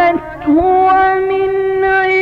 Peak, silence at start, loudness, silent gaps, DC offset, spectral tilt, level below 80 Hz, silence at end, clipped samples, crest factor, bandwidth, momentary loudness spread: -4 dBFS; 0 s; -12 LUFS; none; under 0.1%; -7 dB/octave; -38 dBFS; 0 s; under 0.1%; 8 dB; 5.2 kHz; 5 LU